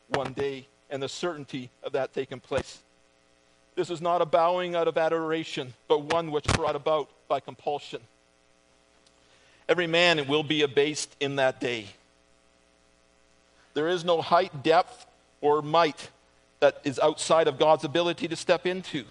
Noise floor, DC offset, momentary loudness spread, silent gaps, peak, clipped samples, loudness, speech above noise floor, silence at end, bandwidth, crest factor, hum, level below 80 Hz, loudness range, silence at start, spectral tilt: -63 dBFS; under 0.1%; 13 LU; none; -6 dBFS; under 0.1%; -26 LUFS; 37 dB; 0.05 s; 10.5 kHz; 22 dB; none; -54 dBFS; 7 LU; 0.1 s; -4 dB/octave